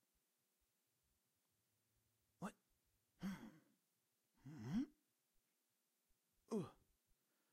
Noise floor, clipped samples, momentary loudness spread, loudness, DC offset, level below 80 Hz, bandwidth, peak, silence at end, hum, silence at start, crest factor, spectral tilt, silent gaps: -88 dBFS; under 0.1%; 14 LU; -51 LUFS; under 0.1%; -80 dBFS; 15.5 kHz; -34 dBFS; 0.8 s; none; 2.4 s; 22 dB; -7 dB/octave; none